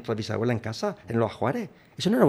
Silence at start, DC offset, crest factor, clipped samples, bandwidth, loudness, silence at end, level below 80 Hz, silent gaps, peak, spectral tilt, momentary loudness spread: 0 s; under 0.1%; 20 dB; under 0.1%; 14.5 kHz; -28 LUFS; 0 s; -62 dBFS; none; -6 dBFS; -6.5 dB/octave; 6 LU